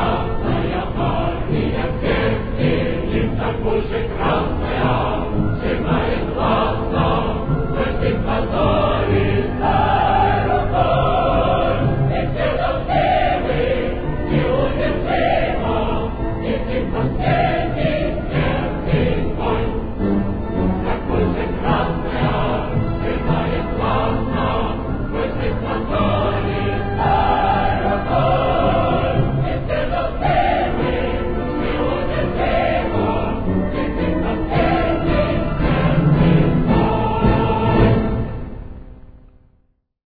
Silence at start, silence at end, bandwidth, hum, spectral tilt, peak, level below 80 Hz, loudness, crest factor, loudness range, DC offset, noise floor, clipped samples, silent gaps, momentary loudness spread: 0 s; 0.9 s; 5 kHz; none; -10.5 dB/octave; 0 dBFS; -26 dBFS; -19 LUFS; 18 dB; 3 LU; under 0.1%; -60 dBFS; under 0.1%; none; 5 LU